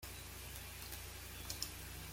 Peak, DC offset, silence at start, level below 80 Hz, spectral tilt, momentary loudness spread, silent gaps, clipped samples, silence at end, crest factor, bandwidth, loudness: -22 dBFS; under 0.1%; 0 s; -56 dBFS; -2 dB/octave; 5 LU; none; under 0.1%; 0 s; 26 dB; 16.5 kHz; -47 LUFS